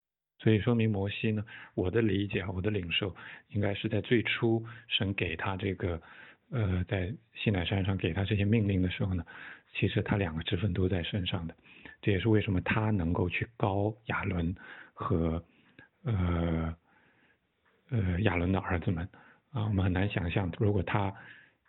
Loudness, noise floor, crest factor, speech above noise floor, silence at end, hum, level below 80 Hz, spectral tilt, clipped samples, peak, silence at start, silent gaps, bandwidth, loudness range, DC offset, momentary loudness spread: -31 LUFS; -72 dBFS; 20 dB; 41 dB; 0.3 s; none; -50 dBFS; -10.5 dB/octave; under 0.1%; -12 dBFS; 0.4 s; none; 4.1 kHz; 3 LU; under 0.1%; 11 LU